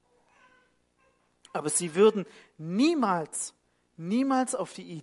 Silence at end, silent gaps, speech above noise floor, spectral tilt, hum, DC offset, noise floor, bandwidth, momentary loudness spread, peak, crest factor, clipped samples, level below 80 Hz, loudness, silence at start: 0 s; none; 41 dB; -4.5 dB/octave; 60 Hz at -55 dBFS; under 0.1%; -69 dBFS; 11.5 kHz; 15 LU; -8 dBFS; 20 dB; under 0.1%; -80 dBFS; -27 LUFS; 1.55 s